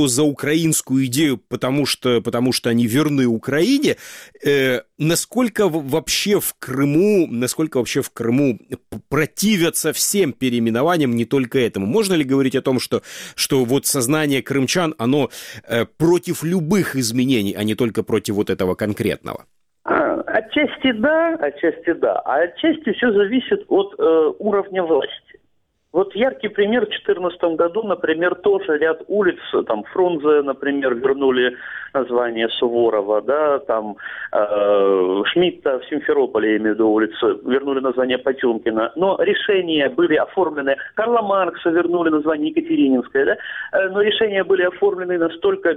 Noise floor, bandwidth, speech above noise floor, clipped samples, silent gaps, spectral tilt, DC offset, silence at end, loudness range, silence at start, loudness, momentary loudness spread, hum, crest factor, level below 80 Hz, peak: -67 dBFS; 16.5 kHz; 48 dB; under 0.1%; none; -4.5 dB/octave; under 0.1%; 0 s; 2 LU; 0 s; -19 LUFS; 5 LU; none; 18 dB; -56 dBFS; -2 dBFS